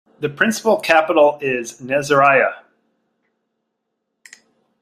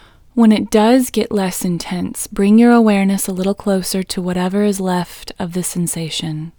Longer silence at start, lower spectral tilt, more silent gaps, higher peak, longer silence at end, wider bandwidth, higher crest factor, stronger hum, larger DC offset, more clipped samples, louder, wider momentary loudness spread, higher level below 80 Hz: second, 0.2 s vs 0.35 s; second, -4 dB/octave vs -5.5 dB/octave; neither; about the same, 0 dBFS vs 0 dBFS; first, 2.25 s vs 0.1 s; second, 15 kHz vs over 20 kHz; about the same, 18 dB vs 16 dB; neither; neither; neither; about the same, -16 LUFS vs -16 LUFS; about the same, 10 LU vs 11 LU; second, -64 dBFS vs -44 dBFS